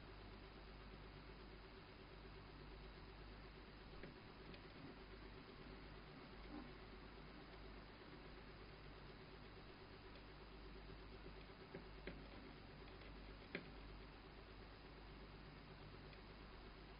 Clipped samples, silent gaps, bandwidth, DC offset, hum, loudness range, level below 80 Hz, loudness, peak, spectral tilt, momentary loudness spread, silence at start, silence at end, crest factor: under 0.1%; none; 5.2 kHz; under 0.1%; none; 2 LU; -64 dBFS; -59 LUFS; -32 dBFS; -4 dB/octave; 3 LU; 0 s; 0 s; 26 dB